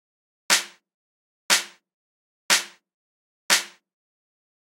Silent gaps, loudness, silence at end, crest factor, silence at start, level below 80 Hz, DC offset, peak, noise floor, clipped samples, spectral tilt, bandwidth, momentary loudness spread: 0.94-1.49 s, 1.94-2.49 s, 2.94-3.49 s; -21 LUFS; 1.1 s; 28 dB; 0.5 s; -90 dBFS; under 0.1%; -2 dBFS; under -90 dBFS; under 0.1%; 1.5 dB/octave; 16 kHz; 19 LU